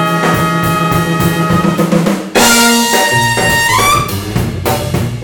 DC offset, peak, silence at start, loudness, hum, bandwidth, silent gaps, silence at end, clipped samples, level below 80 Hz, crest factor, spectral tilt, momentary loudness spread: under 0.1%; 0 dBFS; 0 s; -11 LUFS; none; 18.5 kHz; none; 0 s; under 0.1%; -32 dBFS; 12 dB; -4 dB/octave; 8 LU